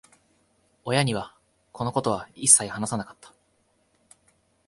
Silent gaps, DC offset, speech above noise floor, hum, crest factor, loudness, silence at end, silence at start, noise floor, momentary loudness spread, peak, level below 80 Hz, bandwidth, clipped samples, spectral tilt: none; under 0.1%; 43 dB; none; 28 dB; -23 LUFS; 1.55 s; 0.85 s; -68 dBFS; 21 LU; 0 dBFS; -60 dBFS; 16 kHz; under 0.1%; -3 dB/octave